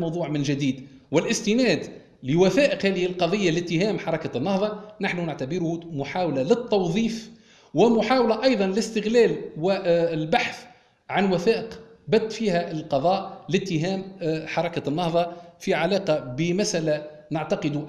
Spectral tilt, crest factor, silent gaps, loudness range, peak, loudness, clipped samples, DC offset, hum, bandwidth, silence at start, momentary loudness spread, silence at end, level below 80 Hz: -5.5 dB/octave; 18 dB; none; 4 LU; -6 dBFS; -24 LUFS; under 0.1%; under 0.1%; none; 12 kHz; 0 s; 9 LU; 0 s; -58 dBFS